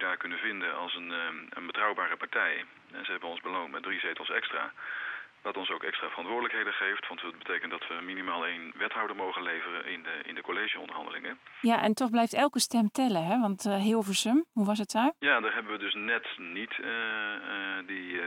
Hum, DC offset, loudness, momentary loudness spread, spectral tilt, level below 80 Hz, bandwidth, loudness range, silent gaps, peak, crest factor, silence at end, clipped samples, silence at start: none; under 0.1%; -31 LUFS; 10 LU; -3.5 dB/octave; -80 dBFS; 16.5 kHz; 6 LU; none; -12 dBFS; 20 dB; 0 s; under 0.1%; 0 s